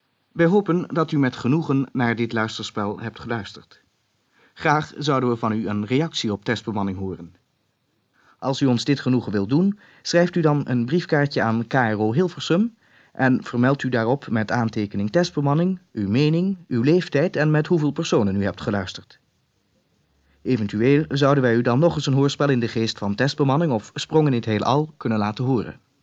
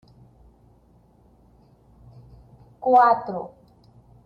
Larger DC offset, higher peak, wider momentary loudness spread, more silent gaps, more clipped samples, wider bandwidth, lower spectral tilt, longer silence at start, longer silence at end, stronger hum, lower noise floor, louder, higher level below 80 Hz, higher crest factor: neither; about the same, -4 dBFS vs -6 dBFS; second, 8 LU vs 18 LU; neither; neither; first, 8 kHz vs 5.4 kHz; about the same, -6.5 dB/octave vs -7.5 dB/octave; second, 0.35 s vs 2.8 s; second, 0.3 s vs 0.8 s; neither; first, -69 dBFS vs -57 dBFS; about the same, -22 LUFS vs -20 LUFS; about the same, -60 dBFS vs -58 dBFS; about the same, 18 dB vs 20 dB